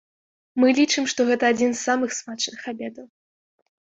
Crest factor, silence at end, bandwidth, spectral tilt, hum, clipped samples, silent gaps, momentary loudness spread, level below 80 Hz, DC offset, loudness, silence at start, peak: 18 dB; 0.8 s; 8 kHz; -2.5 dB/octave; none; under 0.1%; none; 14 LU; -68 dBFS; under 0.1%; -22 LUFS; 0.55 s; -6 dBFS